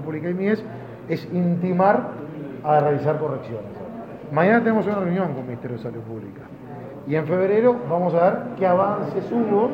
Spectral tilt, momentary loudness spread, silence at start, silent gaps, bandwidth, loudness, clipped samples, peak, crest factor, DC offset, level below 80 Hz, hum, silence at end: -10 dB/octave; 17 LU; 0 s; none; 5.8 kHz; -22 LUFS; under 0.1%; -4 dBFS; 18 dB; under 0.1%; -62 dBFS; none; 0 s